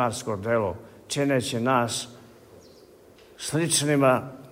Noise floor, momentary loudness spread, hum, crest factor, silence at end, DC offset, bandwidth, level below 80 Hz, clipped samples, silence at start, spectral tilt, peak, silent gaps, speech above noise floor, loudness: -52 dBFS; 11 LU; none; 18 dB; 0 s; under 0.1%; 16 kHz; -62 dBFS; under 0.1%; 0 s; -4 dB/octave; -8 dBFS; none; 27 dB; -25 LUFS